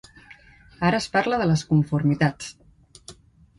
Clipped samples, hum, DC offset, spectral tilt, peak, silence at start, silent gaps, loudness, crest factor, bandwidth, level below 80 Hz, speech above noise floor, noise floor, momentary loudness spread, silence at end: under 0.1%; none; under 0.1%; -6.5 dB/octave; -6 dBFS; 0.3 s; none; -22 LUFS; 18 dB; 11.5 kHz; -52 dBFS; 28 dB; -50 dBFS; 6 LU; 0.45 s